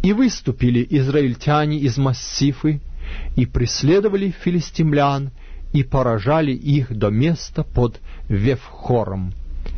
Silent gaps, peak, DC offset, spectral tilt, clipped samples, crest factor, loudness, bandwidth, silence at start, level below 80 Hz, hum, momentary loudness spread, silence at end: none; -4 dBFS; under 0.1%; -6.5 dB/octave; under 0.1%; 14 dB; -19 LUFS; 6.6 kHz; 0 s; -32 dBFS; none; 9 LU; 0 s